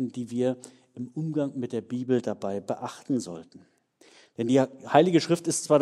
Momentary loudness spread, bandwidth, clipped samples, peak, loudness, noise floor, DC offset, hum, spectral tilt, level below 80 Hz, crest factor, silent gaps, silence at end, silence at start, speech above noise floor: 16 LU; 13.5 kHz; under 0.1%; -4 dBFS; -27 LUFS; -58 dBFS; under 0.1%; none; -5.5 dB/octave; -74 dBFS; 24 dB; none; 0 s; 0 s; 31 dB